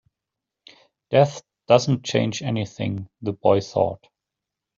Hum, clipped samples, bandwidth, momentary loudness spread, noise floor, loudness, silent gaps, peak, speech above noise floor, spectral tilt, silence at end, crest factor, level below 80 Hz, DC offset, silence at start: none; under 0.1%; 7.8 kHz; 11 LU; -85 dBFS; -22 LUFS; none; -2 dBFS; 64 dB; -6 dB/octave; 0.8 s; 22 dB; -62 dBFS; under 0.1%; 1.1 s